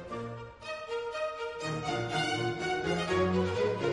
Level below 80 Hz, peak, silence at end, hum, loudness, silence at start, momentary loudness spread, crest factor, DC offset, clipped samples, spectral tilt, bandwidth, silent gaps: -60 dBFS; -18 dBFS; 0 s; none; -32 LUFS; 0 s; 11 LU; 16 dB; under 0.1%; under 0.1%; -5.5 dB/octave; 11 kHz; none